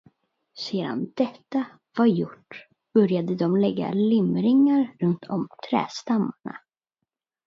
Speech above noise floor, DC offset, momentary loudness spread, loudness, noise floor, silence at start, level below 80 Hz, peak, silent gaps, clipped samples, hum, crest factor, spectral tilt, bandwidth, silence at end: 61 dB; under 0.1%; 14 LU; -24 LUFS; -84 dBFS; 0.55 s; -70 dBFS; -8 dBFS; none; under 0.1%; none; 16 dB; -7.5 dB/octave; 7.4 kHz; 0.9 s